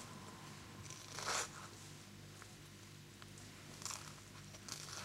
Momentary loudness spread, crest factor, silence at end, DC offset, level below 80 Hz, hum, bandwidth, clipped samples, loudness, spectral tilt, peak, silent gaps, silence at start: 15 LU; 24 dB; 0 s; under 0.1%; -72 dBFS; 50 Hz at -60 dBFS; 16 kHz; under 0.1%; -49 LUFS; -2 dB/octave; -26 dBFS; none; 0 s